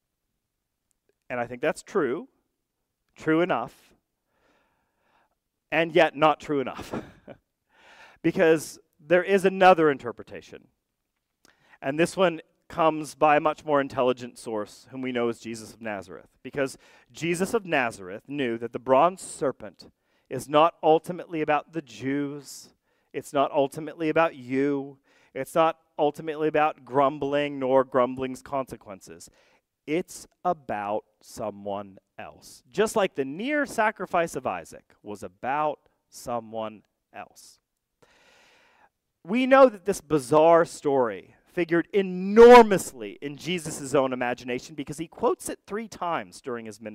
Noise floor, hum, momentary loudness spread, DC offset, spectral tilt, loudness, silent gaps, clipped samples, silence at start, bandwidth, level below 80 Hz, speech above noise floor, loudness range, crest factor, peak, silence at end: -81 dBFS; none; 18 LU; under 0.1%; -5 dB/octave; -24 LUFS; none; under 0.1%; 1.3 s; 15.5 kHz; -60 dBFS; 56 dB; 13 LU; 20 dB; -6 dBFS; 0 s